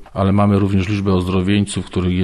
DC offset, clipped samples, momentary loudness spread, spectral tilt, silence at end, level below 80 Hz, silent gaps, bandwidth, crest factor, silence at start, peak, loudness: under 0.1%; under 0.1%; 5 LU; -7 dB/octave; 0 s; -40 dBFS; none; 11.5 kHz; 12 dB; 0 s; -4 dBFS; -17 LUFS